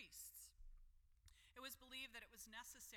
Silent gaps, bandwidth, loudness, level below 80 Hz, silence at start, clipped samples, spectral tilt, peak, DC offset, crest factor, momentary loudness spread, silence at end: none; 19 kHz; -57 LUFS; -70 dBFS; 0 s; under 0.1%; -0.5 dB/octave; -42 dBFS; under 0.1%; 18 dB; 9 LU; 0 s